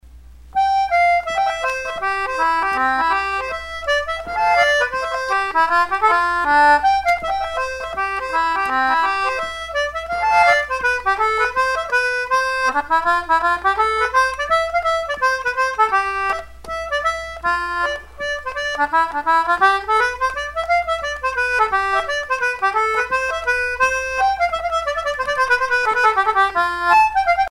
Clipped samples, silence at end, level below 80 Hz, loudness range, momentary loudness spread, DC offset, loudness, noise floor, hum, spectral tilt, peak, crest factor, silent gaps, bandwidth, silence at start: under 0.1%; 0 s; -44 dBFS; 3 LU; 8 LU; under 0.1%; -18 LUFS; -41 dBFS; none; -2 dB/octave; -2 dBFS; 16 dB; none; 16 kHz; 0.05 s